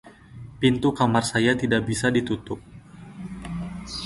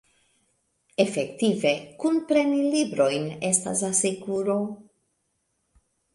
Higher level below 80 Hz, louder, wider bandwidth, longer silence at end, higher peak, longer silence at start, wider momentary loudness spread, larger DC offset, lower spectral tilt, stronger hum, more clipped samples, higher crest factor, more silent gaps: first, -48 dBFS vs -68 dBFS; about the same, -23 LUFS vs -24 LUFS; about the same, 11.5 kHz vs 11.5 kHz; second, 0 s vs 1.35 s; about the same, -6 dBFS vs -6 dBFS; second, 0.05 s vs 1 s; first, 21 LU vs 6 LU; neither; about the same, -5 dB/octave vs -4 dB/octave; neither; neither; about the same, 20 dB vs 22 dB; neither